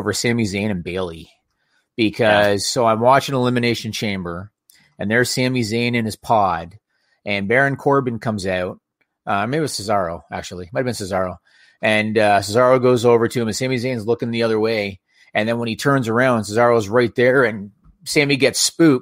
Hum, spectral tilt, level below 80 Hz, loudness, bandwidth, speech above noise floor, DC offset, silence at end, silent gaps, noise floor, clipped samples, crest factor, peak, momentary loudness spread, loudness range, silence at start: none; -4.5 dB/octave; -54 dBFS; -18 LUFS; 16 kHz; 49 dB; under 0.1%; 0 s; none; -66 dBFS; under 0.1%; 18 dB; 0 dBFS; 12 LU; 4 LU; 0 s